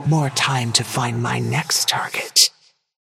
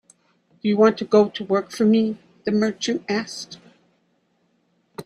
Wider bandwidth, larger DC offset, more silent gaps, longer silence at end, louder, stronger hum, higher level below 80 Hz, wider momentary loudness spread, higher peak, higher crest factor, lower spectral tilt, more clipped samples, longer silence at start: first, 16.5 kHz vs 11.5 kHz; neither; neither; first, 0.5 s vs 0.05 s; first, -18 LUFS vs -21 LUFS; neither; first, -58 dBFS vs -66 dBFS; second, 8 LU vs 14 LU; first, 0 dBFS vs -4 dBFS; about the same, 20 dB vs 18 dB; second, -2.5 dB/octave vs -5.5 dB/octave; neither; second, 0 s vs 0.65 s